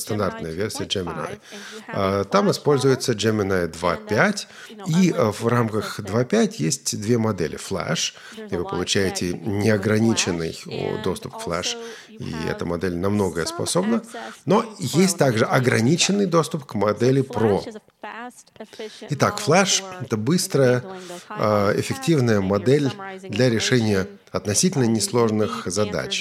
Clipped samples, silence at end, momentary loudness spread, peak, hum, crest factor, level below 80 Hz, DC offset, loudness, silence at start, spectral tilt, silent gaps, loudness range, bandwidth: under 0.1%; 0 s; 14 LU; 0 dBFS; none; 22 dB; -56 dBFS; under 0.1%; -22 LUFS; 0 s; -4.5 dB/octave; none; 4 LU; 16 kHz